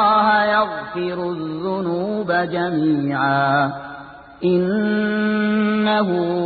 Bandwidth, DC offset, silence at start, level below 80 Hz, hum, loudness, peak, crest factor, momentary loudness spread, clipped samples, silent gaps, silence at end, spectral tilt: 4.8 kHz; under 0.1%; 0 s; -56 dBFS; none; -19 LUFS; -4 dBFS; 14 dB; 9 LU; under 0.1%; none; 0 s; -11.5 dB/octave